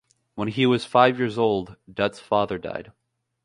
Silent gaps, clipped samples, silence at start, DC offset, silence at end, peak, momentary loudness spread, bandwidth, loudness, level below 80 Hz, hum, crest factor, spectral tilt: none; under 0.1%; 0.35 s; under 0.1%; 0.55 s; -2 dBFS; 16 LU; 11 kHz; -23 LUFS; -58 dBFS; none; 22 dB; -6.5 dB/octave